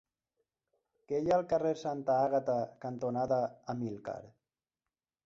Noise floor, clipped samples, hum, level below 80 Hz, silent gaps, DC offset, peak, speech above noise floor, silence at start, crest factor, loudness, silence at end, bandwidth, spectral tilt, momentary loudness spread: under -90 dBFS; under 0.1%; none; -70 dBFS; none; under 0.1%; -18 dBFS; over 57 dB; 1.1 s; 16 dB; -33 LUFS; 0.95 s; 7.6 kHz; -7.5 dB/octave; 10 LU